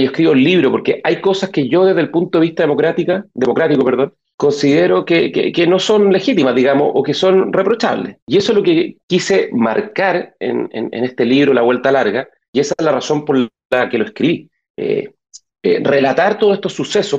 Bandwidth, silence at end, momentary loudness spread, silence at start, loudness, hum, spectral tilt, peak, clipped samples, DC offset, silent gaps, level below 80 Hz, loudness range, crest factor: 8.2 kHz; 0 s; 8 LU; 0 s; -14 LUFS; none; -5.5 dB/octave; -4 dBFS; under 0.1%; under 0.1%; 4.34-4.38 s, 8.22-8.27 s, 9.03-9.08 s, 12.48-12.53 s, 13.65-13.70 s, 14.70-14.74 s; -60 dBFS; 4 LU; 10 dB